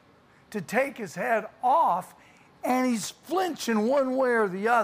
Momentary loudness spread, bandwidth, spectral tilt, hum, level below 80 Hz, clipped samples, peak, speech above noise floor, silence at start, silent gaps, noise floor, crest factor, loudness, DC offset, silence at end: 9 LU; 15.5 kHz; -4.5 dB/octave; none; -72 dBFS; under 0.1%; -10 dBFS; 32 dB; 0.5 s; none; -58 dBFS; 16 dB; -26 LUFS; under 0.1%; 0 s